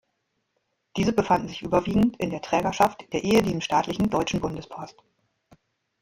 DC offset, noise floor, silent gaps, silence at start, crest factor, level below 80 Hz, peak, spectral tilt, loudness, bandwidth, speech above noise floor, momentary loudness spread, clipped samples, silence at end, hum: under 0.1%; -76 dBFS; none; 0.95 s; 20 dB; -50 dBFS; -4 dBFS; -5.5 dB/octave; -24 LUFS; 16.5 kHz; 52 dB; 13 LU; under 0.1%; 1.1 s; none